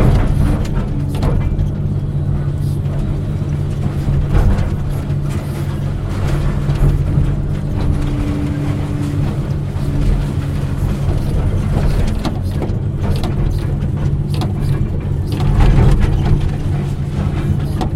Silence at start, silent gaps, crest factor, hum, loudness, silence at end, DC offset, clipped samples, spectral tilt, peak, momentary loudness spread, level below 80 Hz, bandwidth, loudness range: 0 s; none; 16 dB; none; -18 LUFS; 0 s; under 0.1%; under 0.1%; -8 dB/octave; 0 dBFS; 5 LU; -20 dBFS; 13 kHz; 2 LU